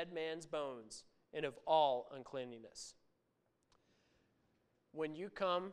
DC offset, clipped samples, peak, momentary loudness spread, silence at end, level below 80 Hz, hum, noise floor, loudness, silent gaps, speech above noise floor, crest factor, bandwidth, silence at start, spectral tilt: under 0.1%; under 0.1%; -22 dBFS; 19 LU; 0 s; -80 dBFS; none; -82 dBFS; -41 LUFS; none; 41 dB; 22 dB; 11.5 kHz; 0 s; -4 dB/octave